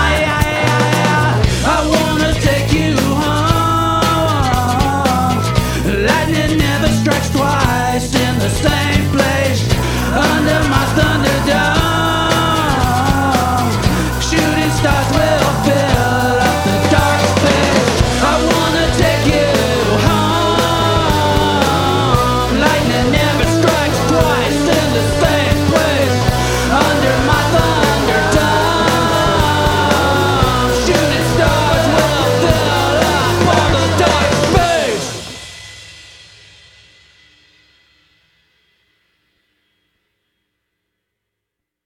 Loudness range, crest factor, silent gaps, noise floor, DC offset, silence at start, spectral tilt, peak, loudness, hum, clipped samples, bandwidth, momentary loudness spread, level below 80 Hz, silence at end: 2 LU; 14 dB; none; -79 dBFS; under 0.1%; 0 s; -5 dB/octave; 0 dBFS; -13 LUFS; none; under 0.1%; 18.5 kHz; 2 LU; -26 dBFS; 5.85 s